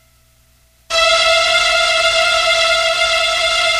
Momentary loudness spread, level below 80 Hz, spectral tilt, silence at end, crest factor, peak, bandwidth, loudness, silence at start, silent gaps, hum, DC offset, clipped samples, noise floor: 2 LU; -44 dBFS; 1 dB/octave; 0 s; 14 dB; -2 dBFS; 16 kHz; -12 LUFS; 0.9 s; none; none; under 0.1%; under 0.1%; -53 dBFS